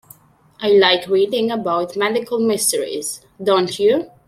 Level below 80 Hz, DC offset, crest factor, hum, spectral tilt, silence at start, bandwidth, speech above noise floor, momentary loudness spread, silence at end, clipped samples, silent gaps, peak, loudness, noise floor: -62 dBFS; under 0.1%; 16 dB; none; -3 dB/octave; 0.6 s; 15.5 kHz; 31 dB; 11 LU; 0.2 s; under 0.1%; none; -2 dBFS; -18 LUFS; -48 dBFS